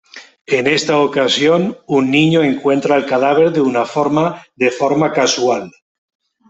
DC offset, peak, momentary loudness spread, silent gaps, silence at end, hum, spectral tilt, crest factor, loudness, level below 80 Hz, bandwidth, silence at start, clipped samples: under 0.1%; -2 dBFS; 5 LU; 0.41-0.45 s; 0.8 s; none; -4.5 dB/octave; 14 dB; -14 LUFS; -58 dBFS; 8.2 kHz; 0.15 s; under 0.1%